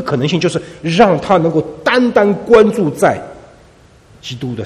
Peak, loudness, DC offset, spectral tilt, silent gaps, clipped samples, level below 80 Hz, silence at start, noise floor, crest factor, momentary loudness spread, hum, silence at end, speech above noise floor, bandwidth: 0 dBFS; -13 LUFS; under 0.1%; -6 dB/octave; none; 0.2%; -46 dBFS; 0 s; -44 dBFS; 14 dB; 15 LU; none; 0 s; 32 dB; 13.5 kHz